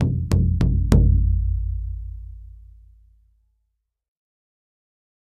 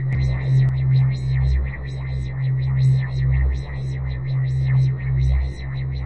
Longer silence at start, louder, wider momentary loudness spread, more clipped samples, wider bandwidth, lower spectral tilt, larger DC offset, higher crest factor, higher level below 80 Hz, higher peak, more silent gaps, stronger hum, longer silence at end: about the same, 0 s vs 0 s; about the same, -21 LUFS vs -21 LUFS; first, 19 LU vs 9 LU; neither; first, 10 kHz vs 4.4 kHz; about the same, -8.5 dB/octave vs -8.5 dB/octave; neither; first, 22 dB vs 10 dB; about the same, -26 dBFS vs -26 dBFS; first, 0 dBFS vs -10 dBFS; neither; neither; first, 2.8 s vs 0 s